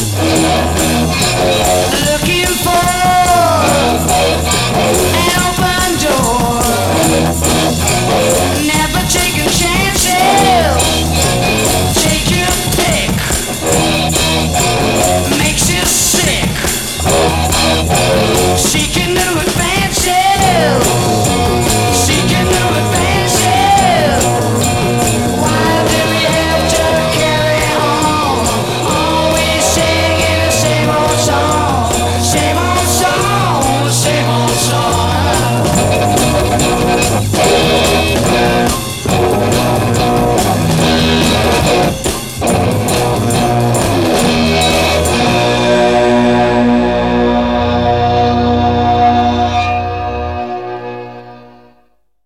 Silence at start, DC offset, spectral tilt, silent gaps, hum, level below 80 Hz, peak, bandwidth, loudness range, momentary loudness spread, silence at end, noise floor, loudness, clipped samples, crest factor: 0 s; 0.9%; -4 dB/octave; none; none; -26 dBFS; 0 dBFS; 18 kHz; 1 LU; 3 LU; 0.75 s; -56 dBFS; -11 LUFS; under 0.1%; 12 dB